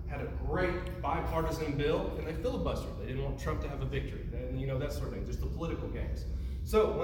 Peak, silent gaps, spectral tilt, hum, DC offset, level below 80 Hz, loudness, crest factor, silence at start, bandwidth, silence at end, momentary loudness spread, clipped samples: -14 dBFS; none; -7 dB/octave; none; under 0.1%; -38 dBFS; -35 LUFS; 20 dB; 0 s; 17 kHz; 0 s; 7 LU; under 0.1%